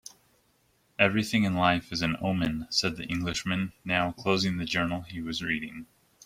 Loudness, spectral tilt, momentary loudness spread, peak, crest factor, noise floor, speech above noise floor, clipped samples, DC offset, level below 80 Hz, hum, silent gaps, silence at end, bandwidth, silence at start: -28 LUFS; -4.5 dB/octave; 10 LU; -6 dBFS; 24 dB; -68 dBFS; 40 dB; under 0.1%; under 0.1%; -54 dBFS; none; none; 0.4 s; 15.5 kHz; 1 s